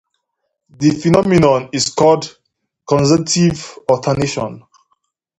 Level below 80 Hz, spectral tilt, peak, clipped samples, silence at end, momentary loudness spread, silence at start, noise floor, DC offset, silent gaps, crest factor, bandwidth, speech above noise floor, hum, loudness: -46 dBFS; -5.5 dB/octave; 0 dBFS; under 0.1%; 0.8 s; 9 LU; 0.8 s; -73 dBFS; under 0.1%; none; 16 dB; 11 kHz; 59 dB; none; -15 LUFS